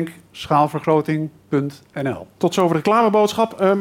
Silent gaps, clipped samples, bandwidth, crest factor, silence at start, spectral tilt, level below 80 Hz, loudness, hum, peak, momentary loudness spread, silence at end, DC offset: none; under 0.1%; 16.5 kHz; 14 dB; 0 s; -6.5 dB/octave; -60 dBFS; -19 LUFS; none; -4 dBFS; 11 LU; 0 s; under 0.1%